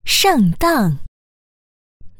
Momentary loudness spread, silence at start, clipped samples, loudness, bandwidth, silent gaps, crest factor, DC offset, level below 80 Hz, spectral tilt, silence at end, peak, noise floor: 9 LU; 0.05 s; under 0.1%; -15 LUFS; over 20 kHz; 1.08-2.00 s; 14 dB; under 0.1%; -38 dBFS; -4 dB/octave; 0.1 s; -4 dBFS; under -90 dBFS